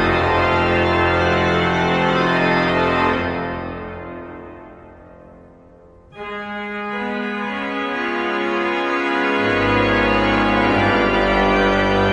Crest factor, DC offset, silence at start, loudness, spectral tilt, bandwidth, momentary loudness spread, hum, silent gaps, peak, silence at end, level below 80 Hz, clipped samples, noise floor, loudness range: 14 dB; under 0.1%; 0 s; -18 LUFS; -6.5 dB/octave; 10.5 kHz; 13 LU; none; none; -4 dBFS; 0 s; -36 dBFS; under 0.1%; -46 dBFS; 14 LU